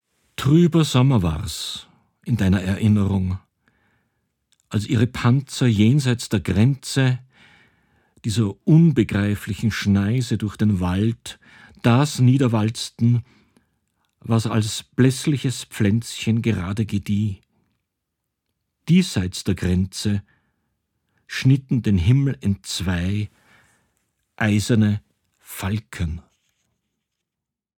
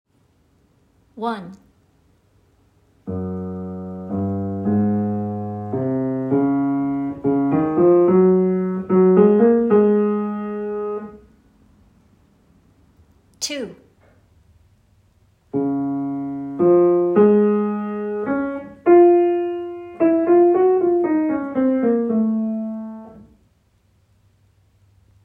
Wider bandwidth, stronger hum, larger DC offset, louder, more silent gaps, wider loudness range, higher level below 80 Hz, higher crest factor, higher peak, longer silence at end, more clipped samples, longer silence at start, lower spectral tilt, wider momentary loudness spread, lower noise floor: first, 18 kHz vs 8.8 kHz; neither; neither; about the same, -21 LUFS vs -19 LUFS; neither; second, 4 LU vs 17 LU; first, -44 dBFS vs -60 dBFS; about the same, 18 dB vs 18 dB; about the same, -2 dBFS vs -2 dBFS; second, 1.6 s vs 2.05 s; neither; second, 0.4 s vs 1.15 s; second, -6.5 dB/octave vs -8 dB/octave; second, 11 LU vs 15 LU; first, -85 dBFS vs -60 dBFS